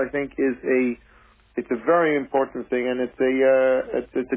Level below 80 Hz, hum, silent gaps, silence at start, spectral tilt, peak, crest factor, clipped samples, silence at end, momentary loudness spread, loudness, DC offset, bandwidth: -56 dBFS; none; none; 0 s; -9.5 dB/octave; -8 dBFS; 14 dB; under 0.1%; 0 s; 9 LU; -22 LUFS; under 0.1%; 3.7 kHz